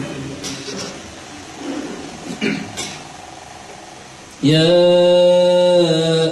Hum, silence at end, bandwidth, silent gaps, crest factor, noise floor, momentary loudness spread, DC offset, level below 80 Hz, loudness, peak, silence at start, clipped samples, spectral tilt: none; 0 s; 12 kHz; none; 14 dB; -38 dBFS; 24 LU; under 0.1%; -52 dBFS; -15 LUFS; -2 dBFS; 0 s; under 0.1%; -5 dB/octave